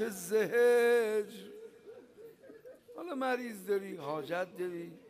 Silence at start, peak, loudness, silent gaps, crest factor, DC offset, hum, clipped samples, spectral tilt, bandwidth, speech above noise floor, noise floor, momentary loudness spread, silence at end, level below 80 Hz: 0 s; -20 dBFS; -32 LUFS; none; 14 dB; under 0.1%; none; under 0.1%; -4.5 dB/octave; 15.5 kHz; 23 dB; -55 dBFS; 25 LU; 0 s; -82 dBFS